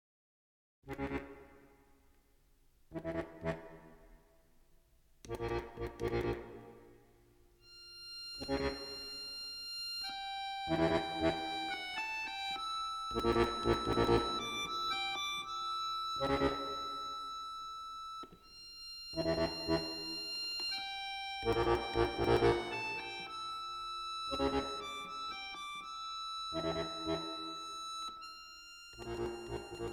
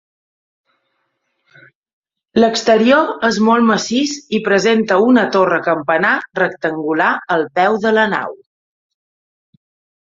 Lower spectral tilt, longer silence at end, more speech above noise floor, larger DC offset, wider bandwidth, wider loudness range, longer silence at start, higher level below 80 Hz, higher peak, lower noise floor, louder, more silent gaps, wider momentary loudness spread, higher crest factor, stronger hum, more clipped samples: about the same, -4.5 dB/octave vs -4.5 dB/octave; second, 0 s vs 1.7 s; second, 35 dB vs 55 dB; neither; first, 18 kHz vs 7.8 kHz; first, 10 LU vs 4 LU; second, 0.85 s vs 2.35 s; first, -54 dBFS vs -60 dBFS; second, -16 dBFS vs 0 dBFS; about the same, -68 dBFS vs -69 dBFS; second, -37 LUFS vs -14 LUFS; neither; first, 15 LU vs 7 LU; first, 22 dB vs 16 dB; neither; neither